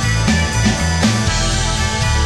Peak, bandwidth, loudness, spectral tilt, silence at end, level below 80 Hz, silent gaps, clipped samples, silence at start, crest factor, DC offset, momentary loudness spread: -2 dBFS; 13.5 kHz; -16 LUFS; -4 dB/octave; 0 s; -22 dBFS; none; under 0.1%; 0 s; 14 dB; under 0.1%; 2 LU